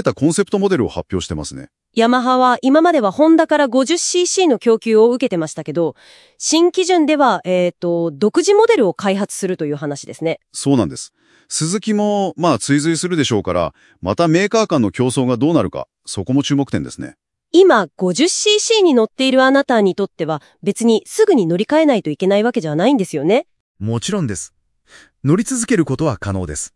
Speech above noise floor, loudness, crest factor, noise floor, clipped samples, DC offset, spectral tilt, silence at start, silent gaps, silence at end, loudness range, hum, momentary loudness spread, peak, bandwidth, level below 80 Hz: 33 dB; -16 LUFS; 16 dB; -48 dBFS; under 0.1%; under 0.1%; -4.5 dB/octave; 0 s; 23.60-23.75 s; 0.1 s; 5 LU; none; 11 LU; 0 dBFS; 12 kHz; -52 dBFS